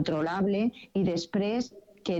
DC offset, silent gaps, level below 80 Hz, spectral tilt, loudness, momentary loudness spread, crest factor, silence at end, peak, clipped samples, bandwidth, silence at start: under 0.1%; none; -60 dBFS; -6.5 dB/octave; -30 LUFS; 7 LU; 12 dB; 0 s; -18 dBFS; under 0.1%; 8 kHz; 0 s